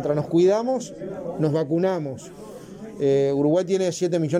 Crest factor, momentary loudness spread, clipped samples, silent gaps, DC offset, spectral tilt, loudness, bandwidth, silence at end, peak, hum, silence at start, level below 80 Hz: 12 dB; 20 LU; under 0.1%; none; under 0.1%; -7 dB/octave; -22 LUFS; 11 kHz; 0 s; -10 dBFS; none; 0 s; -60 dBFS